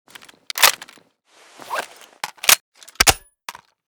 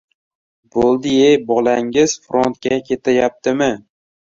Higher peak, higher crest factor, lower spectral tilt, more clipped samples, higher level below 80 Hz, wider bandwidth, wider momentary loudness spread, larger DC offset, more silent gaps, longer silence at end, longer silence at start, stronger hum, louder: about the same, 0 dBFS vs -2 dBFS; first, 22 dB vs 16 dB; second, 0.5 dB/octave vs -4.5 dB/octave; neither; first, -42 dBFS vs -52 dBFS; first, over 20 kHz vs 7.8 kHz; first, 22 LU vs 7 LU; neither; first, 2.60-2.72 s vs none; second, 0.4 s vs 0.55 s; second, 0.55 s vs 0.75 s; neither; about the same, -17 LUFS vs -16 LUFS